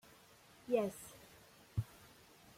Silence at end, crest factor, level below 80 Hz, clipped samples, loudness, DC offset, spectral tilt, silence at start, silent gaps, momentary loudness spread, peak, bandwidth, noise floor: 0.7 s; 22 dB; -64 dBFS; under 0.1%; -41 LUFS; under 0.1%; -6.5 dB/octave; 0.7 s; none; 24 LU; -22 dBFS; 16.5 kHz; -64 dBFS